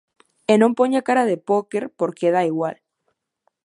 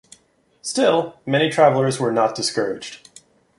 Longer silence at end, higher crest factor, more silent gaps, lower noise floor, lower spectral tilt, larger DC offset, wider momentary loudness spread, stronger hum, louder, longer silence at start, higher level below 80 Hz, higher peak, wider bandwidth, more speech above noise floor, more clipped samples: first, 0.95 s vs 0.65 s; about the same, 18 dB vs 18 dB; neither; first, -73 dBFS vs -59 dBFS; first, -6 dB/octave vs -4.5 dB/octave; neither; second, 10 LU vs 13 LU; neither; about the same, -20 LUFS vs -19 LUFS; second, 0.5 s vs 0.65 s; second, -74 dBFS vs -64 dBFS; about the same, -2 dBFS vs -2 dBFS; about the same, 11.5 kHz vs 11.5 kHz; first, 54 dB vs 40 dB; neither